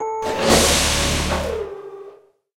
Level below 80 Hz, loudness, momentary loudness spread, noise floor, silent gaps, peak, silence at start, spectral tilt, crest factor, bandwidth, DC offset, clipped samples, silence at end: -30 dBFS; -18 LUFS; 18 LU; -46 dBFS; none; 0 dBFS; 0 s; -3 dB/octave; 20 dB; 16.5 kHz; under 0.1%; under 0.1%; 0.4 s